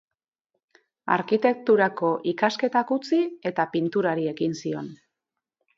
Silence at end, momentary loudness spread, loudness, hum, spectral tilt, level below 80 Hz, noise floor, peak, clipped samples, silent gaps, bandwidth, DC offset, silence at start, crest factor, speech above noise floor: 0.8 s; 10 LU; -24 LUFS; none; -6 dB/octave; -74 dBFS; -85 dBFS; -4 dBFS; under 0.1%; none; 7.6 kHz; under 0.1%; 1.05 s; 20 dB; 62 dB